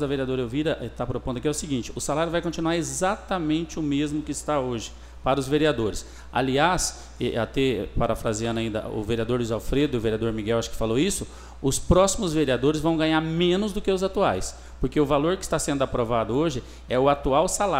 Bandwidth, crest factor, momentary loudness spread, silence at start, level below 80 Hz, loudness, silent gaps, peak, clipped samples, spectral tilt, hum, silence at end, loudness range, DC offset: 16 kHz; 18 dB; 8 LU; 0 s; -38 dBFS; -25 LUFS; none; -6 dBFS; under 0.1%; -5 dB/octave; none; 0 s; 3 LU; under 0.1%